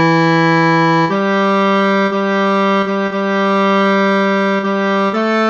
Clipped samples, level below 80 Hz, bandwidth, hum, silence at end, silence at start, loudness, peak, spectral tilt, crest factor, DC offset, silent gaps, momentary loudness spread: under 0.1%; -64 dBFS; 7.4 kHz; none; 0 s; 0 s; -13 LUFS; -2 dBFS; -6.5 dB/octave; 12 dB; under 0.1%; none; 4 LU